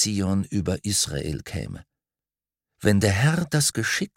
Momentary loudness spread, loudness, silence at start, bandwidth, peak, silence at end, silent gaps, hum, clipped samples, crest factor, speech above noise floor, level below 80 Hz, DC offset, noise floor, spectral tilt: 13 LU; -23 LUFS; 0 s; 16.5 kHz; -4 dBFS; 0.1 s; none; none; under 0.1%; 22 dB; over 66 dB; -48 dBFS; under 0.1%; under -90 dBFS; -4 dB/octave